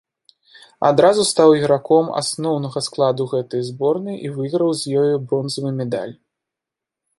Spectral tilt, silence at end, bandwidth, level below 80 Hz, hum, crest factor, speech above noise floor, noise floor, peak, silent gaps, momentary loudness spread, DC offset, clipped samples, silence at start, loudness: -5 dB/octave; 1.05 s; 11.5 kHz; -64 dBFS; none; 18 dB; 68 dB; -85 dBFS; -2 dBFS; none; 11 LU; under 0.1%; under 0.1%; 0.8 s; -18 LUFS